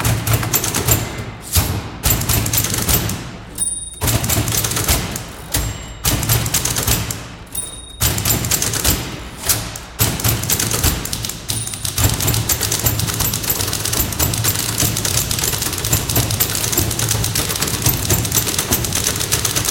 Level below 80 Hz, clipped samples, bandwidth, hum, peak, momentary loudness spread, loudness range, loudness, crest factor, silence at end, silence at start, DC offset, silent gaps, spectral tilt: -30 dBFS; under 0.1%; 17 kHz; none; 0 dBFS; 7 LU; 2 LU; -17 LUFS; 18 dB; 0 s; 0 s; under 0.1%; none; -2.5 dB/octave